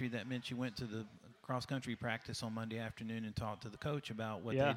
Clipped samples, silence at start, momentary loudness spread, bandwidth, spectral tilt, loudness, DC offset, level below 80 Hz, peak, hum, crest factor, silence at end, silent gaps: under 0.1%; 0 s; 5 LU; 16 kHz; -6 dB/octave; -42 LUFS; under 0.1%; -68 dBFS; -22 dBFS; none; 20 dB; 0 s; none